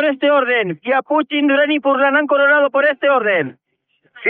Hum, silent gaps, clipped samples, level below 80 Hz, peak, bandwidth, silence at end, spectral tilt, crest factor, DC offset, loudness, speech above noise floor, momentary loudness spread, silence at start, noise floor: none; none; under 0.1%; -76 dBFS; -2 dBFS; 4.2 kHz; 0 s; -1.5 dB/octave; 12 dB; under 0.1%; -15 LUFS; 48 dB; 5 LU; 0 s; -63 dBFS